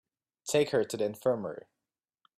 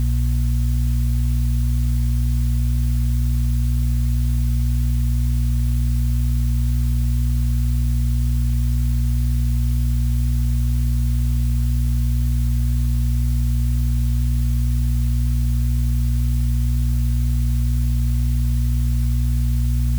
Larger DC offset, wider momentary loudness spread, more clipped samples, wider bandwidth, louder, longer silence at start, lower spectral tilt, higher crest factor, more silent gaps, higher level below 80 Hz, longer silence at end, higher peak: neither; first, 15 LU vs 0 LU; neither; second, 15.5 kHz vs over 20 kHz; second, -31 LUFS vs -21 LUFS; first, 0.45 s vs 0 s; second, -4.5 dB/octave vs -6.5 dB/octave; first, 18 dB vs 6 dB; neither; second, -74 dBFS vs -20 dBFS; first, 0.8 s vs 0 s; about the same, -14 dBFS vs -12 dBFS